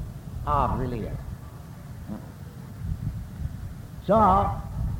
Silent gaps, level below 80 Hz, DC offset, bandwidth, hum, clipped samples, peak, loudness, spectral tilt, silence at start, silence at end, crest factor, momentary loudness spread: none; -36 dBFS; under 0.1%; 17 kHz; none; under 0.1%; -10 dBFS; -26 LUFS; -8.5 dB/octave; 0 s; 0 s; 18 dB; 21 LU